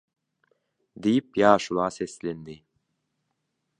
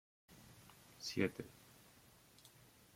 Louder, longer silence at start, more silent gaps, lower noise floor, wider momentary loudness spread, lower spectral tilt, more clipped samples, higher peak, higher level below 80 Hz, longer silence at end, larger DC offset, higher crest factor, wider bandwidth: first, -24 LUFS vs -43 LUFS; first, 1 s vs 0.3 s; neither; first, -78 dBFS vs -66 dBFS; second, 16 LU vs 24 LU; about the same, -5.5 dB/octave vs -4.5 dB/octave; neither; first, -2 dBFS vs -20 dBFS; first, -64 dBFS vs -76 dBFS; first, 1.25 s vs 0.5 s; neither; about the same, 26 dB vs 28 dB; second, 10.5 kHz vs 16.5 kHz